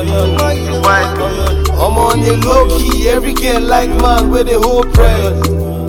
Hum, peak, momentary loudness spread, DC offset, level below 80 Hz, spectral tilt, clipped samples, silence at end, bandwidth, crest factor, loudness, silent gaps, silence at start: none; 0 dBFS; 4 LU; under 0.1%; -16 dBFS; -5.5 dB/octave; under 0.1%; 0 s; 17.5 kHz; 10 dB; -12 LUFS; none; 0 s